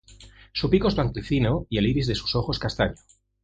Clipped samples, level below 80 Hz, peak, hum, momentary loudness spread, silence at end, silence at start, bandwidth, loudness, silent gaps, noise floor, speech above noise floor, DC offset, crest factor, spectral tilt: under 0.1%; -38 dBFS; -6 dBFS; none; 6 LU; 0.5 s; 0.1 s; 9 kHz; -25 LUFS; none; -49 dBFS; 25 dB; under 0.1%; 18 dB; -7 dB/octave